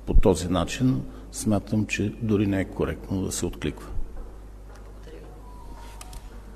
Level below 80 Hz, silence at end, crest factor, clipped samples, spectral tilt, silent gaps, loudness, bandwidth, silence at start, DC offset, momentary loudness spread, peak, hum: -30 dBFS; 0 s; 20 dB; under 0.1%; -6 dB/octave; none; -26 LUFS; 13.5 kHz; 0 s; under 0.1%; 21 LU; -6 dBFS; none